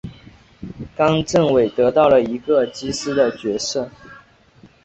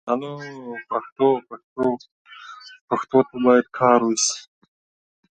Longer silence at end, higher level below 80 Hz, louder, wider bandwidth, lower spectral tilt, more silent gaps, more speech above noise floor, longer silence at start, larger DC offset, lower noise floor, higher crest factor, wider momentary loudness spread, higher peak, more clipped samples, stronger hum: second, 0.65 s vs 0.95 s; first, -48 dBFS vs -66 dBFS; first, -18 LUFS vs -21 LUFS; second, 8.4 kHz vs 9.4 kHz; first, -5 dB/octave vs -3.5 dB/octave; second, none vs 1.12-1.16 s, 1.64-1.76 s, 2.12-2.25 s, 2.81-2.88 s; first, 32 dB vs 21 dB; about the same, 0.05 s vs 0.05 s; neither; first, -50 dBFS vs -42 dBFS; about the same, 16 dB vs 20 dB; about the same, 19 LU vs 21 LU; about the same, -2 dBFS vs -2 dBFS; neither; neither